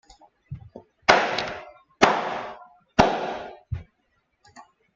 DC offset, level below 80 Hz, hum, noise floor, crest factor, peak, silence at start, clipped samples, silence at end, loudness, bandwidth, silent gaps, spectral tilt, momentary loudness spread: under 0.1%; -50 dBFS; none; -71 dBFS; 26 dB; 0 dBFS; 0.5 s; under 0.1%; 0.35 s; -23 LUFS; 8.6 kHz; none; -4 dB/octave; 22 LU